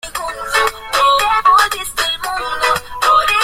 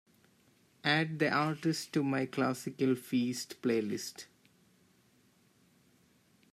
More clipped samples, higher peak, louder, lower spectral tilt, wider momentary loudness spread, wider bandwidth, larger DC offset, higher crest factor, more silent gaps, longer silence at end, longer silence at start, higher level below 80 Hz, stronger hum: neither; first, 0 dBFS vs -16 dBFS; first, -14 LUFS vs -33 LUFS; second, 0 dB/octave vs -5 dB/octave; about the same, 9 LU vs 8 LU; about the same, 16.5 kHz vs 15 kHz; neither; second, 14 dB vs 20 dB; neither; second, 0 s vs 2.3 s; second, 0.05 s vs 0.85 s; first, -40 dBFS vs -80 dBFS; neither